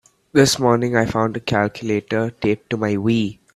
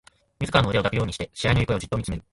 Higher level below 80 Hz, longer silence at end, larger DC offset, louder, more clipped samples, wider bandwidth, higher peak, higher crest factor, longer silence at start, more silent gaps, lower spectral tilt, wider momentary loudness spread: second, -50 dBFS vs -40 dBFS; about the same, 0.2 s vs 0.1 s; neither; first, -19 LUFS vs -24 LUFS; neither; first, 14 kHz vs 11.5 kHz; first, 0 dBFS vs -6 dBFS; about the same, 18 dB vs 20 dB; about the same, 0.35 s vs 0.4 s; neither; about the same, -5 dB/octave vs -5.5 dB/octave; about the same, 7 LU vs 8 LU